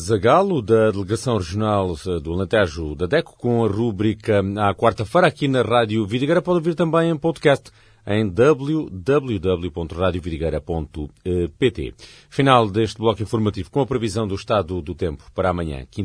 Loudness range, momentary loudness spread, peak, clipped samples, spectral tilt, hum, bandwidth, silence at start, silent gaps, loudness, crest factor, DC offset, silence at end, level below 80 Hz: 4 LU; 10 LU; 0 dBFS; under 0.1%; -6.5 dB/octave; none; 11 kHz; 0 s; none; -20 LUFS; 20 dB; under 0.1%; 0 s; -42 dBFS